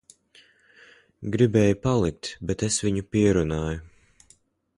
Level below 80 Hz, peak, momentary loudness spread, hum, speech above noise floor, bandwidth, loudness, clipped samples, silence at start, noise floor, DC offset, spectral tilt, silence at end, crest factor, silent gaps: -44 dBFS; -6 dBFS; 12 LU; none; 38 dB; 11.5 kHz; -24 LUFS; under 0.1%; 1.2 s; -61 dBFS; under 0.1%; -5.5 dB/octave; 0.9 s; 20 dB; none